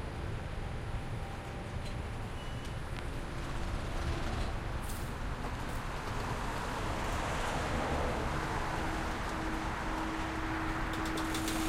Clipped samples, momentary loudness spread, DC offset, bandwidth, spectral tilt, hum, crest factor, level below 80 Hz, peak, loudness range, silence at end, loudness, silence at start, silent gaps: under 0.1%; 7 LU; under 0.1%; 16 kHz; -5 dB/octave; none; 14 dB; -42 dBFS; -22 dBFS; 5 LU; 0 s; -37 LUFS; 0 s; none